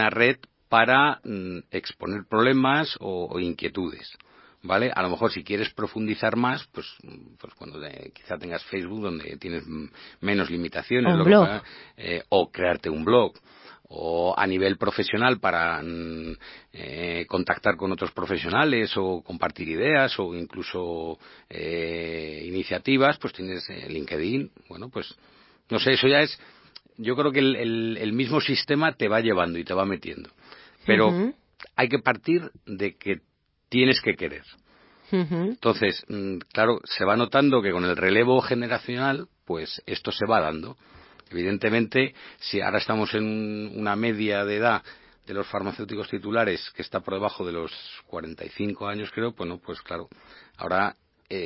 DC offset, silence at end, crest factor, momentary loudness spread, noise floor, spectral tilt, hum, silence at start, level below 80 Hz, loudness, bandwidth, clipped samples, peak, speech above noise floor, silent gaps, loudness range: under 0.1%; 0 s; 24 dB; 16 LU; -50 dBFS; -9.5 dB/octave; none; 0 s; -54 dBFS; -25 LUFS; 5.8 kHz; under 0.1%; -2 dBFS; 25 dB; none; 7 LU